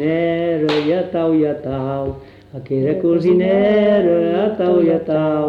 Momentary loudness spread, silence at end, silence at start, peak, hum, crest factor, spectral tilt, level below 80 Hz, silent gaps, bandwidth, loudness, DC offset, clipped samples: 10 LU; 0 s; 0 s; -6 dBFS; none; 10 dB; -8.5 dB/octave; -48 dBFS; none; 6.6 kHz; -16 LUFS; under 0.1%; under 0.1%